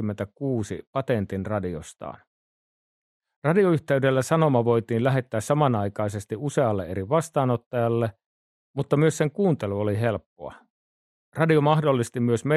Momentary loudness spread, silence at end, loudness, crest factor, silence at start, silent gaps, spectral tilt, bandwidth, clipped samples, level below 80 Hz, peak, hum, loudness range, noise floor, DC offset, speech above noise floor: 12 LU; 0 s; -24 LUFS; 18 dB; 0 s; 0.87-0.93 s, 2.27-3.20 s, 3.36-3.42 s, 7.66-7.71 s, 8.26-8.74 s, 10.26-10.36 s, 10.70-11.32 s; -7 dB/octave; 13 kHz; under 0.1%; -62 dBFS; -6 dBFS; none; 4 LU; under -90 dBFS; under 0.1%; over 67 dB